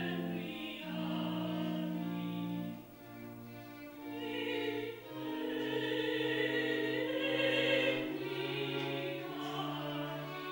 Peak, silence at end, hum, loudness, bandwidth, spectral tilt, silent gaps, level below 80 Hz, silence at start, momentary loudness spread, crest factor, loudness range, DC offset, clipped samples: -20 dBFS; 0 s; none; -37 LUFS; 16 kHz; -6 dB/octave; none; -74 dBFS; 0 s; 16 LU; 16 dB; 7 LU; under 0.1%; under 0.1%